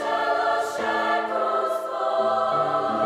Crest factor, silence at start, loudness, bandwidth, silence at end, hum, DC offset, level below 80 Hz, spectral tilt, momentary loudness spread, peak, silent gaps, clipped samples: 12 dB; 0 s; -23 LUFS; 14.5 kHz; 0 s; none; under 0.1%; -68 dBFS; -4 dB/octave; 3 LU; -10 dBFS; none; under 0.1%